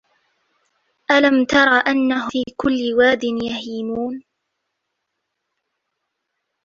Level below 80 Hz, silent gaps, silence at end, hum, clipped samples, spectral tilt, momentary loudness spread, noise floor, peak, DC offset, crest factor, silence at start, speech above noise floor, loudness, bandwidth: -54 dBFS; none; 2.45 s; none; under 0.1%; -4 dB/octave; 12 LU; -77 dBFS; -2 dBFS; under 0.1%; 20 dB; 1.1 s; 59 dB; -17 LUFS; 7.4 kHz